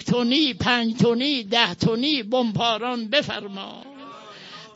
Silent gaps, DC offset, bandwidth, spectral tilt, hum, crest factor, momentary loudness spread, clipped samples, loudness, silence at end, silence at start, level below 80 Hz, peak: none; under 0.1%; 8 kHz; -5 dB/octave; none; 20 dB; 20 LU; under 0.1%; -21 LUFS; 0.05 s; 0 s; -56 dBFS; -4 dBFS